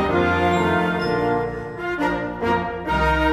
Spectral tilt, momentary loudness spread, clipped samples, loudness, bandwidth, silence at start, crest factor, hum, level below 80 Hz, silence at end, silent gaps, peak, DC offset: -6.5 dB/octave; 6 LU; under 0.1%; -21 LUFS; 15.5 kHz; 0 s; 14 dB; none; -34 dBFS; 0 s; none; -8 dBFS; under 0.1%